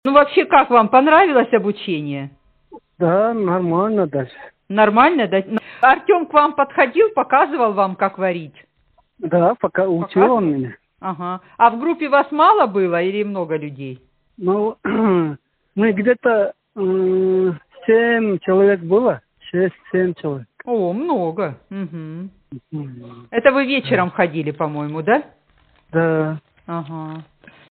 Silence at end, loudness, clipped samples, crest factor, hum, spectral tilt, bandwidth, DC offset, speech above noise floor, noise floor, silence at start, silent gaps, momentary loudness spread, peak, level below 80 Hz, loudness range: 0.5 s; -17 LUFS; under 0.1%; 16 dB; none; -4.5 dB/octave; 4.5 kHz; under 0.1%; 43 dB; -60 dBFS; 0.05 s; none; 16 LU; 0 dBFS; -60 dBFS; 6 LU